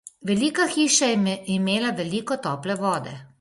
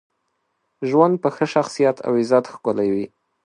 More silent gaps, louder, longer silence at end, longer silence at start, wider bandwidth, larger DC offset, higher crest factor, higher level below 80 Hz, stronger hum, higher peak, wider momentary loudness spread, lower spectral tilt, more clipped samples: neither; second, -23 LUFS vs -20 LUFS; second, 0.15 s vs 0.4 s; second, 0.2 s vs 0.8 s; about the same, 11.5 kHz vs 11 kHz; neither; about the same, 18 dB vs 20 dB; about the same, -64 dBFS vs -66 dBFS; neither; second, -6 dBFS vs -2 dBFS; about the same, 9 LU vs 9 LU; second, -3.5 dB/octave vs -6.5 dB/octave; neither